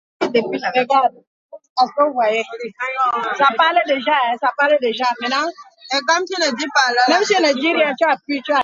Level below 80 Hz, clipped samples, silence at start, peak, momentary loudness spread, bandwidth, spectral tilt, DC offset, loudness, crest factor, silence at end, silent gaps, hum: -72 dBFS; under 0.1%; 0.2 s; 0 dBFS; 7 LU; 7.8 kHz; -2 dB/octave; under 0.1%; -17 LUFS; 18 dB; 0 s; 1.27-1.49 s, 1.70-1.76 s; none